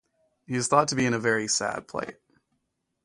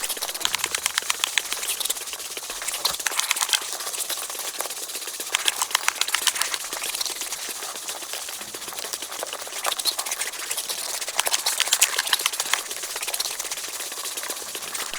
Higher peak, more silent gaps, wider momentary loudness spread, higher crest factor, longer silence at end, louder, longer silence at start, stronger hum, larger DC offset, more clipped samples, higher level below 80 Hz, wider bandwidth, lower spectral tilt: second, -6 dBFS vs 0 dBFS; neither; first, 13 LU vs 9 LU; second, 22 dB vs 28 dB; first, 0.95 s vs 0 s; about the same, -26 LUFS vs -25 LUFS; first, 0.5 s vs 0 s; neither; neither; neither; about the same, -64 dBFS vs -66 dBFS; second, 11.5 kHz vs over 20 kHz; first, -3.5 dB/octave vs 2.5 dB/octave